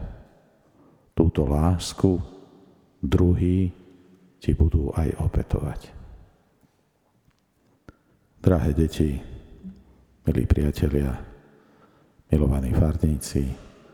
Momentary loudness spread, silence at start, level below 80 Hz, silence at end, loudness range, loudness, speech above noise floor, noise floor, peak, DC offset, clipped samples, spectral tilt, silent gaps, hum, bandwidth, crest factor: 19 LU; 0 s; -34 dBFS; 0.3 s; 6 LU; -24 LUFS; 44 dB; -66 dBFS; -2 dBFS; under 0.1%; under 0.1%; -7.5 dB/octave; none; none; 15 kHz; 24 dB